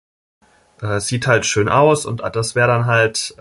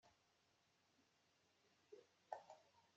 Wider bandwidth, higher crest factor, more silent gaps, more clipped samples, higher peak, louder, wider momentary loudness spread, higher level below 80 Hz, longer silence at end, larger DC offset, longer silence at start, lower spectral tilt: first, 11.5 kHz vs 7.6 kHz; second, 16 dB vs 32 dB; neither; neither; first, -2 dBFS vs -34 dBFS; first, -16 LUFS vs -62 LUFS; about the same, 9 LU vs 10 LU; first, -46 dBFS vs under -90 dBFS; about the same, 0.1 s vs 0 s; neither; first, 0.8 s vs 0.05 s; first, -4.5 dB/octave vs -1.5 dB/octave